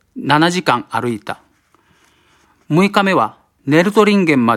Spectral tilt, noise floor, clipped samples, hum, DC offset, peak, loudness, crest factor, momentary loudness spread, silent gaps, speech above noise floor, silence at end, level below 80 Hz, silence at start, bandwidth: -5.5 dB/octave; -56 dBFS; under 0.1%; none; under 0.1%; 0 dBFS; -15 LUFS; 16 dB; 14 LU; none; 42 dB; 0 s; -58 dBFS; 0.15 s; 14.5 kHz